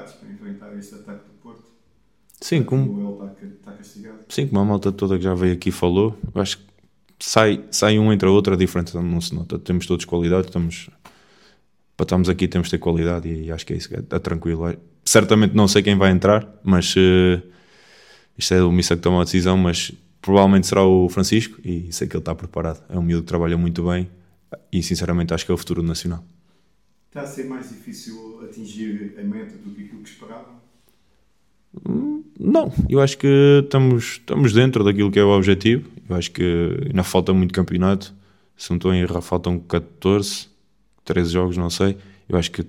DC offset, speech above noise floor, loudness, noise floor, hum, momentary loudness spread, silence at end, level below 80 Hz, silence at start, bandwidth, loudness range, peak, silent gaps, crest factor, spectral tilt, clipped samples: under 0.1%; 47 dB; -19 LUFS; -66 dBFS; none; 20 LU; 0 s; -42 dBFS; 0 s; 16 kHz; 13 LU; 0 dBFS; none; 20 dB; -5.5 dB/octave; under 0.1%